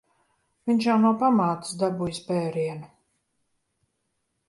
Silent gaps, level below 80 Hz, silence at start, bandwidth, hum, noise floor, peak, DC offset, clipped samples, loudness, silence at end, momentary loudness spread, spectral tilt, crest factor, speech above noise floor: none; -66 dBFS; 0.65 s; 11.5 kHz; none; -76 dBFS; -10 dBFS; under 0.1%; under 0.1%; -24 LUFS; 1.6 s; 11 LU; -6.5 dB/octave; 16 dB; 53 dB